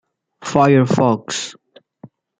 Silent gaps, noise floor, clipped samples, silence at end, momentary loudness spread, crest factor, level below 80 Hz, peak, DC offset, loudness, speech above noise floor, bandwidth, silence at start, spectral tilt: none; -45 dBFS; under 0.1%; 0.35 s; 16 LU; 18 dB; -56 dBFS; 0 dBFS; under 0.1%; -16 LUFS; 30 dB; 9.4 kHz; 0.4 s; -6 dB/octave